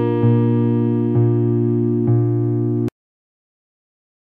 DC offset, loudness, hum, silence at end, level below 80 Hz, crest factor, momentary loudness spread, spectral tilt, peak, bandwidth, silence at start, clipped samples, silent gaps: under 0.1%; -18 LUFS; none; 1.35 s; -58 dBFS; 14 dB; 4 LU; -12 dB/octave; -4 dBFS; 3.3 kHz; 0 s; under 0.1%; none